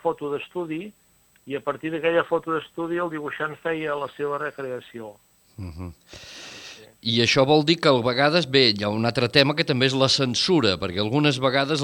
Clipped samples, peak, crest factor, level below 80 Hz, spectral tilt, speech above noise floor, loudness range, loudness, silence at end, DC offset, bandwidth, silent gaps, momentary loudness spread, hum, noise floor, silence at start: under 0.1%; 0 dBFS; 24 dB; -56 dBFS; -4.5 dB/octave; 21 dB; 12 LU; -22 LUFS; 0 s; under 0.1%; 17 kHz; none; 21 LU; none; -44 dBFS; 0.05 s